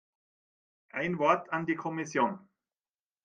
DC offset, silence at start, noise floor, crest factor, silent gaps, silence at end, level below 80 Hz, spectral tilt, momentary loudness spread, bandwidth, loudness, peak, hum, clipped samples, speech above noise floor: under 0.1%; 0.95 s; under -90 dBFS; 24 dB; none; 0.85 s; -76 dBFS; -6 dB/octave; 10 LU; 9 kHz; -31 LUFS; -10 dBFS; none; under 0.1%; over 60 dB